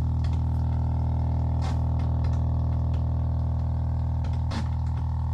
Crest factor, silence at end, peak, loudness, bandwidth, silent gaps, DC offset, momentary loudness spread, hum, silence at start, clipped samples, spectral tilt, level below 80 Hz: 10 dB; 0 s; -16 dBFS; -27 LUFS; 6.2 kHz; none; under 0.1%; 2 LU; none; 0 s; under 0.1%; -9 dB/octave; -32 dBFS